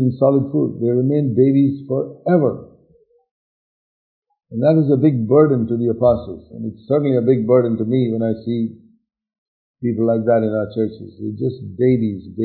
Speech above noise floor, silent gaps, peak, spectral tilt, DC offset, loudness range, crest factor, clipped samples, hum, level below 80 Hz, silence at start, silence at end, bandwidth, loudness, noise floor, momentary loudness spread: 39 dB; 3.31-4.22 s, 9.38-9.74 s; -2 dBFS; -14 dB/octave; under 0.1%; 5 LU; 16 dB; under 0.1%; none; -54 dBFS; 0 s; 0 s; 4.5 kHz; -18 LUFS; -56 dBFS; 11 LU